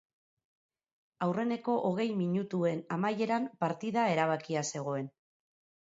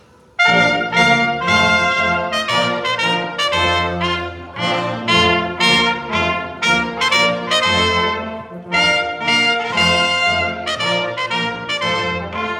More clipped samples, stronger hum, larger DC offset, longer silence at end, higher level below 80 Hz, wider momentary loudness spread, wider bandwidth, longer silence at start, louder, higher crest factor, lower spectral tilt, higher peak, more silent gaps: neither; neither; neither; first, 0.75 s vs 0 s; second, -80 dBFS vs -44 dBFS; about the same, 6 LU vs 7 LU; second, 8 kHz vs 16.5 kHz; first, 1.2 s vs 0.4 s; second, -32 LUFS vs -15 LUFS; about the same, 18 dB vs 16 dB; first, -6 dB/octave vs -3.5 dB/octave; second, -14 dBFS vs 0 dBFS; neither